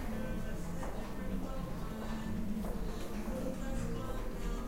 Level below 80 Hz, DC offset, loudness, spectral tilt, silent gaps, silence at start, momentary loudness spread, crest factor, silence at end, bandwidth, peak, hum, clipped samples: -42 dBFS; under 0.1%; -41 LUFS; -6.5 dB/octave; none; 0 s; 3 LU; 12 dB; 0 s; 16 kHz; -24 dBFS; none; under 0.1%